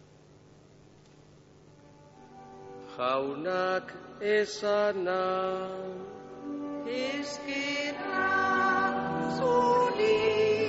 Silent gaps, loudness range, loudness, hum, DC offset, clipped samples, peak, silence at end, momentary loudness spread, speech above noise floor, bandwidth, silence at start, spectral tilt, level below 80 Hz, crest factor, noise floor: none; 8 LU; -29 LUFS; none; under 0.1%; under 0.1%; -14 dBFS; 0 s; 17 LU; 28 dB; 8 kHz; 2.2 s; -2.5 dB/octave; -66 dBFS; 16 dB; -56 dBFS